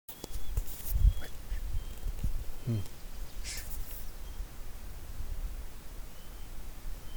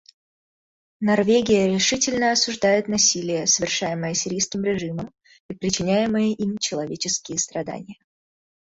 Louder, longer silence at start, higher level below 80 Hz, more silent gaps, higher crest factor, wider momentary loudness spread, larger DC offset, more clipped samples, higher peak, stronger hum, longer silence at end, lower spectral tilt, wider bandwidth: second, -40 LUFS vs -21 LUFS; second, 0.1 s vs 1 s; first, -36 dBFS vs -56 dBFS; second, none vs 5.40-5.49 s; about the same, 20 dB vs 18 dB; first, 15 LU vs 11 LU; neither; neither; second, -14 dBFS vs -6 dBFS; neither; second, 0 s vs 0.75 s; first, -5 dB/octave vs -3 dB/octave; first, over 20 kHz vs 8 kHz